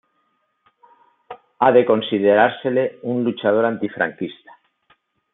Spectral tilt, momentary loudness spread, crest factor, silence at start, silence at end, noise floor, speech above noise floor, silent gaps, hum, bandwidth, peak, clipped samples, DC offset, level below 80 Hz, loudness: -10.5 dB/octave; 8 LU; 18 dB; 1.3 s; 1 s; -68 dBFS; 50 dB; none; none; 4 kHz; -2 dBFS; under 0.1%; under 0.1%; -70 dBFS; -18 LUFS